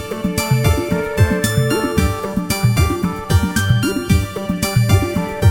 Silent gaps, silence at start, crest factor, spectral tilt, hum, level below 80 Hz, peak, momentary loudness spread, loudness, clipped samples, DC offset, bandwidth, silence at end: none; 0 s; 16 dB; -5.5 dB/octave; none; -28 dBFS; 0 dBFS; 5 LU; -17 LUFS; under 0.1%; under 0.1%; 20 kHz; 0 s